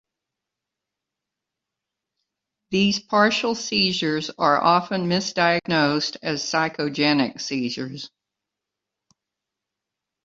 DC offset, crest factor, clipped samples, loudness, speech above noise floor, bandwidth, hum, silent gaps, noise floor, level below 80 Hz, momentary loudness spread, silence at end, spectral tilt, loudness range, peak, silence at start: under 0.1%; 22 dB; under 0.1%; -21 LUFS; 64 dB; 7.8 kHz; none; none; -85 dBFS; -62 dBFS; 8 LU; 2.15 s; -4 dB/octave; 7 LU; -4 dBFS; 2.7 s